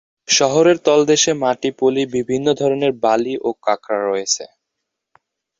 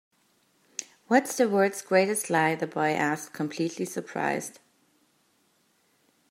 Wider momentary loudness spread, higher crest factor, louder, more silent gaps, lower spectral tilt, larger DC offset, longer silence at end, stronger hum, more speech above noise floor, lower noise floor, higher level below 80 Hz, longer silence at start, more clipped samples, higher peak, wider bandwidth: second, 7 LU vs 15 LU; second, 16 dB vs 22 dB; first, -17 LUFS vs -26 LUFS; neither; second, -3 dB/octave vs -4.5 dB/octave; neither; second, 1.15 s vs 1.75 s; neither; first, 62 dB vs 42 dB; first, -79 dBFS vs -68 dBFS; first, -60 dBFS vs -80 dBFS; second, 0.3 s vs 0.8 s; neither; first, -2 dBFS vs -6 dBFS; second, 7.8 kHz vs 16 kHz